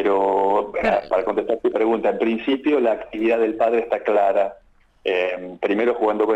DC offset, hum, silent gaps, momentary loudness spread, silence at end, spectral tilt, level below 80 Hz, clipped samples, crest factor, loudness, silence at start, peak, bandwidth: under 0.1%; none; none; 4 LU; 0 s; -6.5 dB/octave; -52 dBFS; under 0.1%; 14 dB; -21 LUFS; 0 s; -6 dBFS; 8 kHz